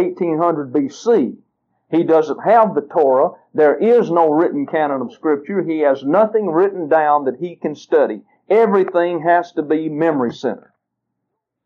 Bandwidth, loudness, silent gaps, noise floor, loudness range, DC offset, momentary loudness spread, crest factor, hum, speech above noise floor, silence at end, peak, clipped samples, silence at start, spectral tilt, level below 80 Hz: 7.2 kHz; -16 LUFS; none; -76 dBFS; 2 LU; under 0.1%; 8 LU; 16 dB; none; 61 dB; 1.1 s; 0 dBFS; under 0.1%; 0 s; -7.5 dB/octave; -74 dBFS